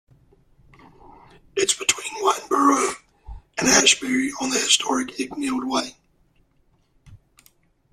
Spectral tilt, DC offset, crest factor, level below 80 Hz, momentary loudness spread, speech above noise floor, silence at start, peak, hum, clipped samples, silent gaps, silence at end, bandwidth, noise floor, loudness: -1 dB/octave; under 0.1%; 22 dB; -52 dBFS; 13 LU; 41 dB; 1.55 s; -2 dBFS; none; under 0.1%; none; 0.75 s; 14.5 kHz; -63 dBFS; -20 LUFS